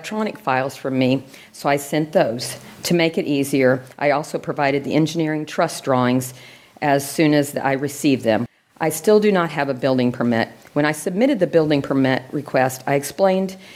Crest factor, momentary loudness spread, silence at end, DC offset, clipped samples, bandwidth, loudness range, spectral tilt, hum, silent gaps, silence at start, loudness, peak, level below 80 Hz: 16 dB; 7 LU; 0 s; under 0.1%; under 0.1%; 16.5 kHz; 2 LU; -5.5 dB/octave; none; none; 0 s; -20 LUFS; -4 dBFS; -62 dBFS